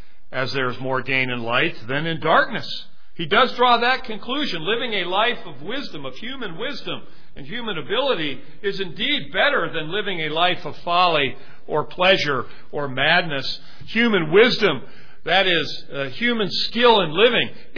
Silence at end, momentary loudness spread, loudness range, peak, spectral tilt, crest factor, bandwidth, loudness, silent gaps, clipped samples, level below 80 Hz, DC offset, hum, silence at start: 0.2 s; 14 LU; 7 LU; -4 dBFS; -5 dB/octave; 18 dB; 5.4 kHz; -20 LUFS; none; under 0.1%; -52 dBFS; 4%; none; 0.3 s